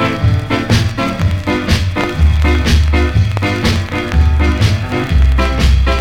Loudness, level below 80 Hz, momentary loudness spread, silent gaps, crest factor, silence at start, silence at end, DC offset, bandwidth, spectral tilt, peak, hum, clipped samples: -14 LUFS; -16 dBFS; 4 LU; none; 10 dB; 0 s; 0 s; under 0.1%; 14.5 kHz; -6 dB/octave; -2 dBFS; none; under 0.1%